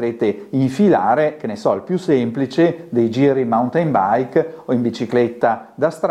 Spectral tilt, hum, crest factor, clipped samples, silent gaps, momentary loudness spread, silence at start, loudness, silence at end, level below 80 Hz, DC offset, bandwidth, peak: -7.5 dB/octave; none; 14 dB; under 0.1%; none; 6 LU; 0 s; -18 LUFS; 0 s; -60 dBFS; under 0.1%; 11.5 kHz; -2 dBFS